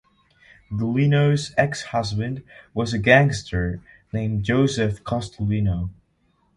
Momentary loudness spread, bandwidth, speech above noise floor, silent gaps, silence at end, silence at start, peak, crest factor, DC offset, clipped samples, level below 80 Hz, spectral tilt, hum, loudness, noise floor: 15 LU; 11 kHz; 44 dB; none; 0.65 s; 0.7 s; -2 dBFS; 22 dB; under 0.1%; under 0.1%; -42 dBFS; -6.5 dB/octave; none; -22 LUFS; -65 dBFS